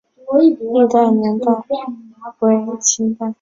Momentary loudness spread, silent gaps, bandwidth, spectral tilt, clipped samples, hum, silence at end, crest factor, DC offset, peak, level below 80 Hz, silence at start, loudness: 11 LU; none; 7.8 kHz; -4.5 dB/octave; under 0.1%; none; 0.1 s; 14 dB; under 0.1%; -2 dBFS; -62 dBFS; 0.25 s; -16 LUFS